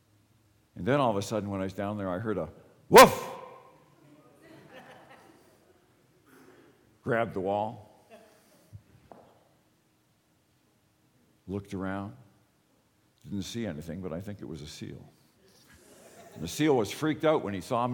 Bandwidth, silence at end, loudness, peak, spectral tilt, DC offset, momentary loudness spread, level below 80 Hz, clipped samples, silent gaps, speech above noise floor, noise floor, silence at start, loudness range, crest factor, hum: 19 kHz; 0 s; -27 LUFS; -4 dBFS; -4.5 dB/octave; under 0.1%; 22 LU; -60 dBFS; under 0.1%; none; 42 dB; -69 dBFS; 0.75 s; 18 LU; 26 dB; none